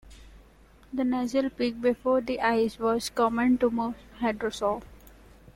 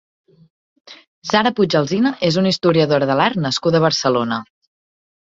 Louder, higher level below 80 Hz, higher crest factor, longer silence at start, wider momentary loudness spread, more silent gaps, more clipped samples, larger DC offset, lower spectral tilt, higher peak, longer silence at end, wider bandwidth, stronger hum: second, -27 LUFS vs -17 LUFS; about the same, -54 dBFS vs -56 dBFS; about the same, 16 dB vs 18 dB; second, 0.05 s vs 0.9 s; first, 7 LU vs 4 LU; second, none vs 1.07-1.22 s; neither; neither; about the same, -5 dB/octave vs -5.5 dB/octave; second, -10 dBFS vs -2 dBFS; second, 0.45 s vs 0.95 s; first, 16.5 kHz vs 7.8 kHz; neither